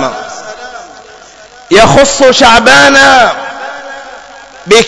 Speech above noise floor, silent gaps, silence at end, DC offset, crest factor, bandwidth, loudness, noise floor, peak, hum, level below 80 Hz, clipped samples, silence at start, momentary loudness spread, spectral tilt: 30 dB; none; 0 s; under 0.1%; 8 dB; 11 kHz; -4 LUFS; -34 dBFS; 0 dBFS; none; -34 dBFS; 8%; 0 s; 22 LU; -2.5 dB/octave